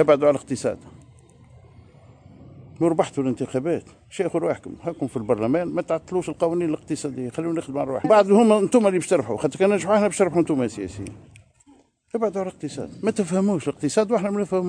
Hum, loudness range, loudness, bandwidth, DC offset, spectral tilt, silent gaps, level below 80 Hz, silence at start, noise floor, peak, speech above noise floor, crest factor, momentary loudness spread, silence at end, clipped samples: none; 8 LU; -22 LUFS; 10 kHz; under 0.1%; -6 dB/octave; none; -58 dBFS; 0 s; -56 dBFS; -4 dBFS; 34 dB; 18 dB; 12 LU; 0 s; under 0.1%